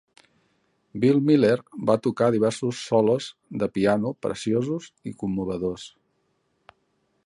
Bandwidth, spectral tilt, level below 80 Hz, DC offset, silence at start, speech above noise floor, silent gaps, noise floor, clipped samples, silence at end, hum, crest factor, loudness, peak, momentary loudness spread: 11 kHz; -6.5 dB/octave; -58 dBFS; under 0.1%; 0.95 s; 48 dB; none; -71 dBFS; under 0.1%; 1.4 s; none; 18 dB; -24 LUFS; -6 dBFS; 13 LU